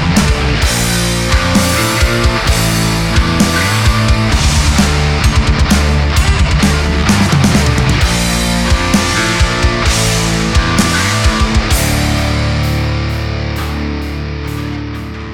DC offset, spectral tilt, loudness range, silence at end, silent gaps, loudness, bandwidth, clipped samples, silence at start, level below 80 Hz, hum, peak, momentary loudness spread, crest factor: under 0.1%; -4.5 dB/octave; 3 LU; 0 s; none; -12 LUFS; 18 kHz; under 0.1%; 0 s; -16 dBFS; none; 0 dBFS; 7 LU; 12 dB